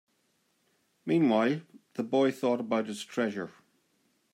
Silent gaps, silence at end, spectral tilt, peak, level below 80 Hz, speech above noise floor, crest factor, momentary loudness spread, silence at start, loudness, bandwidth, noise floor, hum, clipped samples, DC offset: none; 0.85 s; -6 dB/octave; -14 dBFS; -80 dBFS; 45 dB; 16 dB; 15 LU; 1.05 s; -29 LUFS; 15.5 kHz; -73 dBFS; none; under 0.1%; under 0.1%